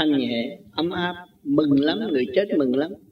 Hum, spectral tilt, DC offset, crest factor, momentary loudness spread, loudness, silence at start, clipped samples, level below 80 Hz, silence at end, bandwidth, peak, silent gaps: none; -8 dB/octave; under 0.1%; 16 dB; 9 LU; -23 LUFS; 0 s; under 0.1%; -60 dBFS; 0.15 s; 5.4 kHz; -6 dBFS; none